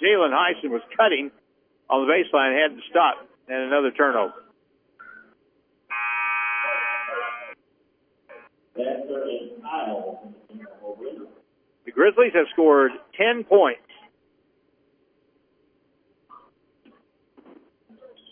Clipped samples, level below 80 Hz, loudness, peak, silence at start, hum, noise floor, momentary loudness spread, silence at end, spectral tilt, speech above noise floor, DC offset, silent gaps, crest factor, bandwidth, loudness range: under 0.1%; -80 dBFS; -22 LUFS; -4 dBFS; 0 s; none; -66 dBFS; 19 LU; 4.55 s; -7 dB/octave; 46 dB; under 0.1%; none; 20 dB; 3.6 kHz; 12 LU